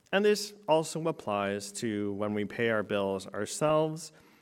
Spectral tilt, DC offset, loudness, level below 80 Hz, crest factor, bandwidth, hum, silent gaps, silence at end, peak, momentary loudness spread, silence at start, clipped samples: -4.5 dB/octave; under 0.1%; -31 LUFS; -72 dBFS; 18 dB; 16.5 kHz; none; none; 0.35 s; -12 dBFS; 7 LU; 0.1 s; under 0.1%